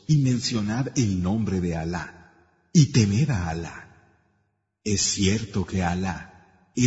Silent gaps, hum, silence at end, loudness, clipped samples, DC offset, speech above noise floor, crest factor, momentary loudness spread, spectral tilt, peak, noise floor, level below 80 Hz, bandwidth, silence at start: none; none; 0 s; -24 LUFS; under 0.1%; under 0.1%; 49 dB; 18 dB; 14 LU; -5 dB/octave; -6 dBFS; -72 dBFS; -48 dBFS; 8 kHz; 0.1 s